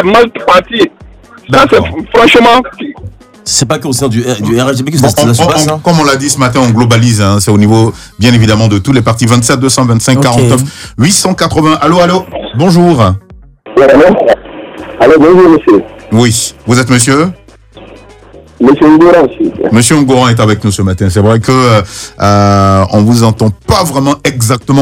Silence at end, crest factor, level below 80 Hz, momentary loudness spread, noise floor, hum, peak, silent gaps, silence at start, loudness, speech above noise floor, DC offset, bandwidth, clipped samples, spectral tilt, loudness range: 0 s; 8 dB; -34 dBFS; 7 LU; -34 dBFS; none; 0 dBFS; none; 0 s; -7 LUFS; 28 dB; under 0.1%; 16.5 kHz; 2%; -5 dB/octave; 2 LU